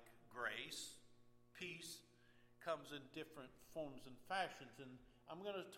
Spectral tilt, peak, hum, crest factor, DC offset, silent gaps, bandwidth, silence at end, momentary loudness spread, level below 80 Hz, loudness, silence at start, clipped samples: -3 dB/octave; -30 dBFS; none; 22 dB; under 0.1%; none; 16.5 kHz; 0 s; 15 LU; -80 dBFS; -51 LUFS; 0 s; under 0.1%